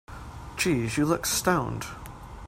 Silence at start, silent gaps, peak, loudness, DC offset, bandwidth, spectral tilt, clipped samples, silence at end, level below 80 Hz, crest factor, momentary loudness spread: 0.1 s; none; -8 dBFS; -26 LUFS; under 0.1%; 16 kHz; -4 dB/octave; under 0.1%; 0 s; -46 dBFS; 20 dB; 18 LU